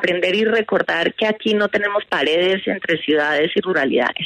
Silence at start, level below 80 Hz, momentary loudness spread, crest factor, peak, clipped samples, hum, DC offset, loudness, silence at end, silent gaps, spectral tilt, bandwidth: 0 s; -62 dBFS; 3 LU; 14 dB; -4 dBFS; under 0.1%; none; under 0.1%; -18 LUFS; 0 s; none; -5 dB/octave; 10 kHz